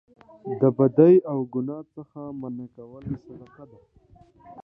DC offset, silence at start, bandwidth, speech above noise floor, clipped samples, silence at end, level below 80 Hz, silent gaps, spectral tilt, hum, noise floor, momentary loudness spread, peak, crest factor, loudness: under 0.1%; 0.45 s; 3.7 kHz; 27 dB; under 0.1%; 0.05 s; -62 dBFS; none; -12.5 dB/octave; none; -50 dBFS; 24 LU; -4 dBFS; 20 dB; -21 LUFS